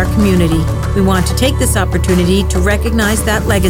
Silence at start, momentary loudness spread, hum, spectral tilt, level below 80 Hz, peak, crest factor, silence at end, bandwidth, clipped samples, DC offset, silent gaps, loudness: 0 s; 2 LU; none; -5.5 dB/octave; -18 dBFS; 0 dBFS; 10 dB; 0 s; 17 kHz; under 0.1%; under 0.1%; none; -13 LUFS